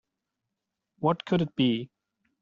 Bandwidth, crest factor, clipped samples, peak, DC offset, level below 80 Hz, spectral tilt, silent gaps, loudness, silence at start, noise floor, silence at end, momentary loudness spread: 7.2 kHz; 18 dB; under 0.1%; -12 dBFS; under 0.1%; -66 dBFS; -5.5 dB/octave; none; -28 LUFS; 1 s; -85 dBFS; 0.55 s; 7 LU